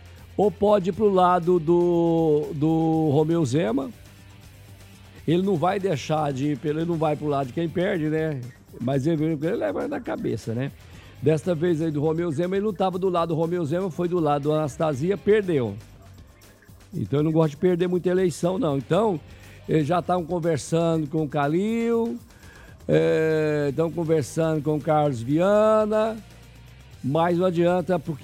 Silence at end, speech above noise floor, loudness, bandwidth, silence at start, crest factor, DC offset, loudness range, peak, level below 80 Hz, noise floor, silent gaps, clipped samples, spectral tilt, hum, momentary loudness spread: 0 s; 27 dB; -23 LUFS; 15.5 kHz; 0 s; 16 dB; under 0.1%; 4 LU; -6 dBFS; -52 dBFS; -50 dBFS; none; under 0.1%; -7.5 dB/octave; none; 8 LU